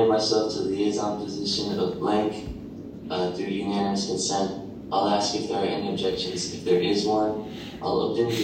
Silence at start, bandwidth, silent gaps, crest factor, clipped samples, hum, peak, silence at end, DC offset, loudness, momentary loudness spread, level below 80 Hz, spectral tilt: 0 s; 16 kHz; none; 16 dB; under 0.1%; none; -10 dBFS; 0 s; under 0.1%; -26 LUFS; 10 LU; -54 dBFS; -4.5 dB/octave